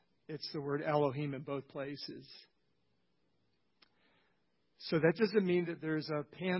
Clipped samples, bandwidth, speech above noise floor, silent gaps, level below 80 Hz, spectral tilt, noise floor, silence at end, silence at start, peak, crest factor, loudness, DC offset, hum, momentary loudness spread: under 0.1%; 5.8 kHz; 45 dB; none; -78 dBFS; -9.5 dB/octave; -80 dBFS; 0 s; 0.3 s; -16 dBFS; 22 dB; -36 LUFS; under 0.1%; none; 16 LU